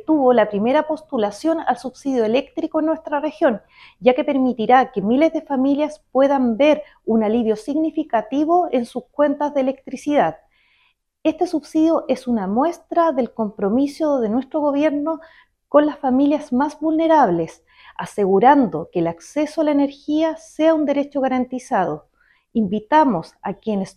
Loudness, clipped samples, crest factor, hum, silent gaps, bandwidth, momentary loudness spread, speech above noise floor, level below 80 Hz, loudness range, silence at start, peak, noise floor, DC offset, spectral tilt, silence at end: -19 LUFS; under 0.1%; 18 dB; none; none; 11.5 kHz; 8 LU; 45 dB; -58 dBFS; 3 LU; 0.1 s; 0 dBFS; -63 dBFS; under 0.1%; -6.5 dB/octave; 0.05 s